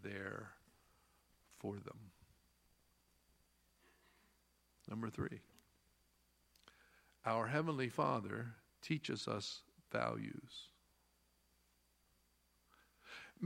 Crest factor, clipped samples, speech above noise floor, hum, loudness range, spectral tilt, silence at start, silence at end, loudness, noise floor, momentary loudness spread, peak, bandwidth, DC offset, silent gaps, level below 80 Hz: 26 dB; under 0.1%; 35 dB; 60 Hz at -75 dBFS; 15 LU; -5.5 dB/octave; 0 s; 0 s; -43 LUFS; -77 dBFS; 18 LU; -22 dBFS; 16.5 kHz; under 0.1%; none; -76 dBFS